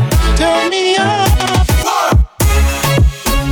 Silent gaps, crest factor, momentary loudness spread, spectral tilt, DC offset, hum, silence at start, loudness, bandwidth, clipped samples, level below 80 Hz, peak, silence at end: none; 10 dB; 1 LU; -4.5 dB/octave; under 0.1%; none; 0 s; -12 LUFS; over 20 kHz; under 0.1%; -16 dBFS; -2 dBFS; 0 s